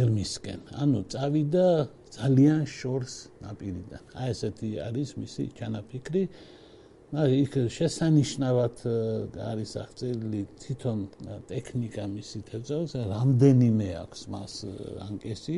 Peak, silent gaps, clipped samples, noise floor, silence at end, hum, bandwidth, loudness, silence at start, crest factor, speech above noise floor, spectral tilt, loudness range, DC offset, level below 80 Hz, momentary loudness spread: -8 dBFS; none; under 0.1%; -53 dBFS; 0 s; none; 11.5 kHz; -28 LUFS; 0 s; 20 dB; 25 dB; -7 dB/octave; 8 LU; under 0.1%; -56 dBFS; 16 LU